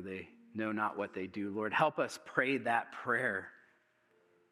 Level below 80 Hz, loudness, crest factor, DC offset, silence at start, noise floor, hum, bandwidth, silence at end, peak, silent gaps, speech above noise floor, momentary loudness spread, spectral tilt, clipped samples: -88 dBFS; -35 LUFS; 24 dB; under 0.1%; 0 s; -72 dBFS; none; 13.5 kHz; 0.95 s; -14 dBFS; none; 37 dB; 12 LU; -5 dB/octave; under 0.1%